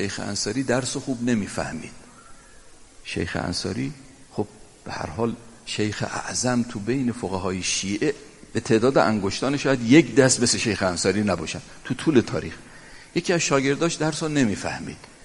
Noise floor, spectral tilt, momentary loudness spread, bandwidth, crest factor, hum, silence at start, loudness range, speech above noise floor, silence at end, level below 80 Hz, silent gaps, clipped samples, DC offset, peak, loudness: -47 dBFS; -4.5 dB/octave; 15 LU; 11.5 kHz; 22 dB; none; 0 s; 10 LU; 24 dB; 0.1 s; -52 dBFS; none; under 0.1%; under 0.1%; -2 dBFS; -23 LUFS